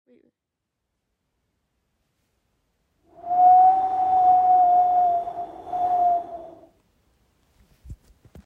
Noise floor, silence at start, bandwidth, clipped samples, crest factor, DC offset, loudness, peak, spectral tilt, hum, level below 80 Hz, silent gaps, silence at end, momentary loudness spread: -83 dBFS; 3.25 s; 3.7 kHz; under 0.1%; 16 dB; under 0.1%; -19 LUFS; -8 dBFS; -7 dB/octave; none; -58 dBFS; none; 0.5 s; 19 LU